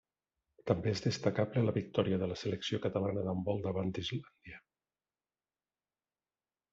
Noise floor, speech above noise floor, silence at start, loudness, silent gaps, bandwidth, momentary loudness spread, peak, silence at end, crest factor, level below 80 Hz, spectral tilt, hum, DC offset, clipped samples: under -90 dBFS; over 56 dB; 0.65 s; -35 LUFS; none; 7.8 kHz; 14 LU; -14 dBFS; 2.15 s; 22 dB; -68 dBFS; -6 dB/octave; none; under 0.1%; under 0.1%